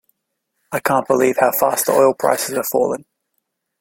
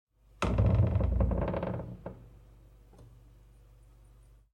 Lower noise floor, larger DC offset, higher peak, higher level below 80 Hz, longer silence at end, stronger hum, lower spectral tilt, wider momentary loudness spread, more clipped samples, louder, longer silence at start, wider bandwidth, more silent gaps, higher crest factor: first, -74 dBFS vs -58 dBFS; neither; first, -2 dBFS vs -16 dBFS; second, -62 dBFS vs -38 dBFS; second, 0.8 s vs 1.5 s; neither; second, -3.5 dB/octave vs -8.5 dB/octave; second, 8 LU vs 19 LU; neither; first, -17 LUFS vs -30 LUFS; first, 0.7 s vs 0.4 s; first, 17 kHz vs 9.6 kHz; neither; about the same, 18 dB vs 18 dB